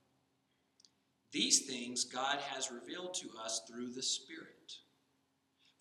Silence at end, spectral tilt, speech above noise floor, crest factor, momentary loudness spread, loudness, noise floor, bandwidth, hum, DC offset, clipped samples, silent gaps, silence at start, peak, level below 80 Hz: 1 s; -0.5 dB/octave; 40 dB; 28 dB; 22 LU; -37 LUFS; -79 dBFS; 13.5 kHz; none; under 0.1%; under 0.1%; none; 1.3 s; -14 dBFS; under -90 dBFS